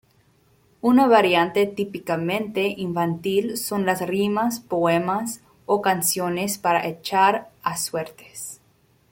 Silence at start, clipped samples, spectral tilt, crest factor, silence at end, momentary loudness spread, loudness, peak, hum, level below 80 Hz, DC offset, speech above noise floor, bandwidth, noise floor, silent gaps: 0.85 s; under 0.1%; -4.5 dB/octave; 20 dB; 0.55 s; 11 LU; -22 LUFS; -4 dBFS; none; -62 dBFS; under 0.1%; 39 dB; 17 kHz; -60 dBFS; none